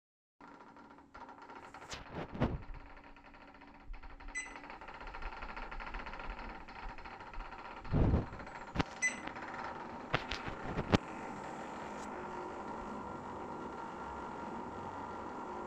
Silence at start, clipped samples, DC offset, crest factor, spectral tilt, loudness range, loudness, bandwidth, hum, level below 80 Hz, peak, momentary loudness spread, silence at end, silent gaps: 0.4 s; under 0.1%; under 0.1%; 34 dB; -5 dB/octave; 9 LU; -41 LUFS; 10.5 kHz; none; -50 dBFS; -8 dBFS; 21 LU; 0 s; none